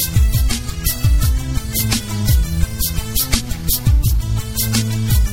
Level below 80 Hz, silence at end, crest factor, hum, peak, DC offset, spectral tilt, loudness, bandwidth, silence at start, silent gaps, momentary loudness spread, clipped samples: -18 dBFS; 0 s; 16 dB; none; 0 dBFS; 1%; -4 dB/octave; -18 LUFS; 19 kHz; 0 s; none; 5 LU; under 0.1%